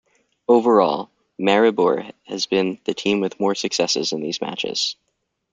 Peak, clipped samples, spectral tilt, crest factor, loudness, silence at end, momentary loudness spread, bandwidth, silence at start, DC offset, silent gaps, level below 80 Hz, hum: -2 dBFS; under 0.1%; -4 dB/octave; 18 dB; -20 LUFS; 0.6 s; 11 LU; 9.4 kHz; 0.5 s; under 0.1%; none; -66 dBFS; none